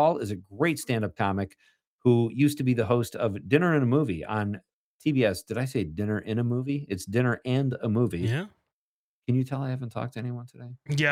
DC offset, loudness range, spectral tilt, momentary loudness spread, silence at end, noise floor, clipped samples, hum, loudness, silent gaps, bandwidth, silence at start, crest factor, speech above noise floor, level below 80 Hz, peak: under 0.1%; 4 LU; -7 dB/octave; 11 LU; 0 s; under -90 dBFS; under 0.1%; none; -27 LUFS; 1.87-1.99 s, 4.73-4.99 s, 8.73-9.22 s; 16 kHz; 0 s; 20 dB; over 64 dB; -62 dBFS; -6 dBFS